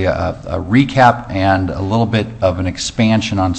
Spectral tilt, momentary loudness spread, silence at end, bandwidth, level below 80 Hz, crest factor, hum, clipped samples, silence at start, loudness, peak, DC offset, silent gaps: -6 dB/octave; 8 LU; 0 s; 8.6 kHz; -36 dBFS; 14 dB; none; under 0.1%; 0 s; -15 LUFS; 0 dBFS; under 0.1%; none